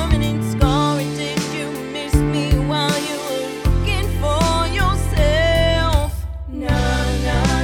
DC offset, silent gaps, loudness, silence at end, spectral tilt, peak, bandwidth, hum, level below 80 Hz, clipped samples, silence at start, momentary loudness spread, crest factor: under 0.1%; none; -19 LUFS; 0 s; -5.5 dB/octave; -2 dBFS; 19 kHz; none; -22 dBFS; under 0.1%; 0 s; 8 LU; 16 dB